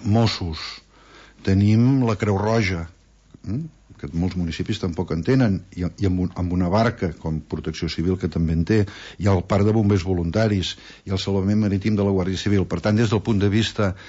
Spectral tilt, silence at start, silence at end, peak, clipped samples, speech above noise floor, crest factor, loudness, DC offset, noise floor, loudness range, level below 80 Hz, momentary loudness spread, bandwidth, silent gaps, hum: -7 dB/octave; 0 s; 0 s; -8 dBFS; under 0.1%; 28 dB; 14 dB; -22 LUFS; under 0.1%; -49 dBFS; 3 LU; -42 dBFS; 11 LU; 8 kHz; none; none